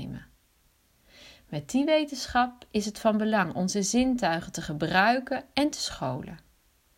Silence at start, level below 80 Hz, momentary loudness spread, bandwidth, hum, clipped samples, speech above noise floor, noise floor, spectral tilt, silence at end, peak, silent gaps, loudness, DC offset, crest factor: 0 s; -54 dBFS; 13 LU; 16 kHz; none; under 0.1%; 39 dB; -66 dBFS; -4 dB/octave; 0.6 s; -8 dBFS; none; -27 LUFS; under 0.1%; 22 dB